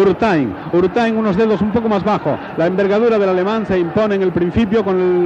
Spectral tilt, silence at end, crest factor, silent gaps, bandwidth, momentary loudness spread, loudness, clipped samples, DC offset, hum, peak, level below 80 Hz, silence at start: -8 dB/octave; 0 s; 10 dB; none; 7.8 kHz; 4 LU; -16 LUFS; under 0.1%; under 0.1%; none; -4 dBFS; -44 dBFS; 0 s